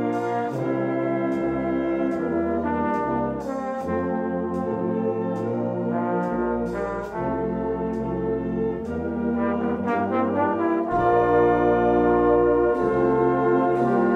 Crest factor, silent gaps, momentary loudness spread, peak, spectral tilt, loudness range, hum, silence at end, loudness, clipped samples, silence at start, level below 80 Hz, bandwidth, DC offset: 14 dB; none; 8 LU; -8 dBFS; -9 dB/octave; 6 LU; none; 0 s; -23 LUFS; under 0.1%; 0 s; -46 dBFS; 8 kHz; under 0.1%